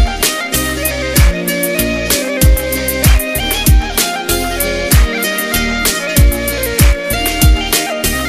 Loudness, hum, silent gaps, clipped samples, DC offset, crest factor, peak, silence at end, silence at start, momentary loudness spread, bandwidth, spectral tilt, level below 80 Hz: -13 LUFS; none; none; under 0.1%; under 0.1%; 12 dB; 0 dBFS; 0 s; 0 s; 4 LU; 16 kHz; -3.5 dB/octave; -16 dBFS